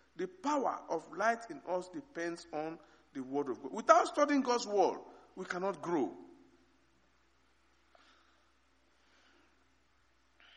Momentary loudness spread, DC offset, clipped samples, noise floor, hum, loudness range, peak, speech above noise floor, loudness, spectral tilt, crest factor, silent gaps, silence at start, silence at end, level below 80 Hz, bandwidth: 19 LU; under 0.1%; under 0.1%; -73 dBFS; none; 10 LU; -10 dBFS; 39 dB; -34 LUFS; -4 dB/octave; 26 dB; none; 0.2 s; 4.3 s; -78 dBFS; 10 kHz